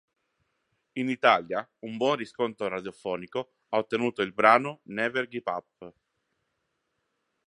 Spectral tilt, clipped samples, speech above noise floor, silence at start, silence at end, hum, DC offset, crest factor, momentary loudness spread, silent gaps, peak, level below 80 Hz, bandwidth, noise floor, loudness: -5.5 dB/octave; under 0.1%; 51 dB; 0.95 s; 1.6 s; none; under 0.1%; 26 dB; 13 LU; none; -2 dBFS; -74 dBFS; 11 kHz; -79 dBFS; -27 LUFS